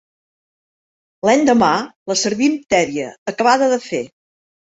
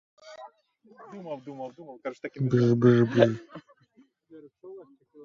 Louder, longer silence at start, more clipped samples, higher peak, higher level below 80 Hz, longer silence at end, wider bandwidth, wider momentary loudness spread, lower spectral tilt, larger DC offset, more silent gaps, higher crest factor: first, -17 LUFS vs -24 LUFS; first, 1.25 s vs 0.25 s; neither; about the same, -2 dBFS vs -4 dBFS; first, -56 dBFS vs -66 dBFS; first, 0.6 s vs 0.4 s; first, 8.2 kHz vs 7.2 kHz; second, 12 LU vs 26 LU; second, -3.5 dB/octave vs -8.5 dB/octave; neither; first, 1.96-2.06 s, 3.18-3.26 s vs none; second, 18 dB vs 26 dB